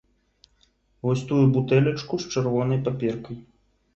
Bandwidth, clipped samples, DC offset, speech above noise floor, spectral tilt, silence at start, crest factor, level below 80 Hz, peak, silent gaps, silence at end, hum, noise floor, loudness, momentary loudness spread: 7.8 kHz; under 0.1%; under 0.1%; 42 dB; -7.5 dB/octave; 1.05 s; 18 dB; -56 dBFS; -6 dBFS; none; 0.55 s; none; -64 dBFS; -24 LUFS; 12 LU